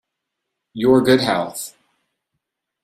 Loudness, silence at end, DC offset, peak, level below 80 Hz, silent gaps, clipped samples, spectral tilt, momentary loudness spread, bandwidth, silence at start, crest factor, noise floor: -17 LUFS; 1.15 s; under 0.1%; -2 dBFS; -56 dBFS; none; under 0.1%; -5 dB/octave; 19 LU; 15 kHz; 0.75 s; 18 dB; -79 dBFS